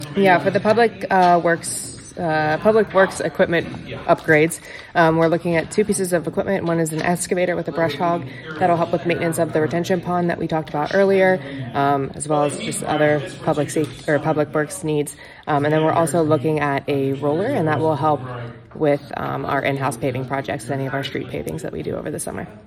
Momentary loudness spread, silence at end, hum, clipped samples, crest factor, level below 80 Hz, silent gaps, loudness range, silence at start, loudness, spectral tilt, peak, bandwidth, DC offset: 10 LU; 0.05 s; none; under 0.1%; 18 dB; -52 dBFS; none; 4 LU; 0 s; -20 LUFS; -5.5 dB/octave; -2 dBFS; 16 kHz; under 0.1%